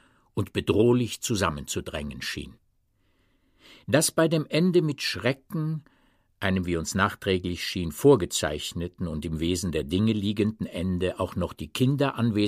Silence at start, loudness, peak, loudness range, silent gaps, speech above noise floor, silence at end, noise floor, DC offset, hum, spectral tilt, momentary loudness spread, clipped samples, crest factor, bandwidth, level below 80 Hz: 0.35 s; -26 LUFS; -6 dBFS; 3 LU; none; 42 dB; 0 s; -68 dBFS; under 0.1%; none; -5 dB/octave; 11 LU; under 0.1%; 20 dB; 15.5 kHz; -48 dBFS